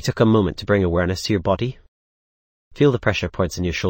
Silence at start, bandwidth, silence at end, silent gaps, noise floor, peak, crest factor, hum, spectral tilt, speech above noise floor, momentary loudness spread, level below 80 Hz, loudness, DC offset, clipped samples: 0 s; 17 kHz; 0 s; 1.88-2.71 s; under -90 dBFS; -4 dBFS; 16 dB; none; -6 dB/octave; over 71 dB; 6 LU; -40 dBFS; -20 LUFS; under 0.1%; under 0.1%